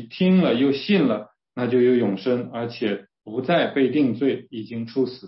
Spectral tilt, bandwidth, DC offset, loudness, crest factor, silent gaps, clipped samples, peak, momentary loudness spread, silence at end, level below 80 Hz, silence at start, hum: -11 dB/octave; 5.8 kHz; under 0.1%; -22 LUFS; 14 dB; none; under 0.1%; -8 dBFS; 12 LU; 0 s; -68 dBFS; 0 s; none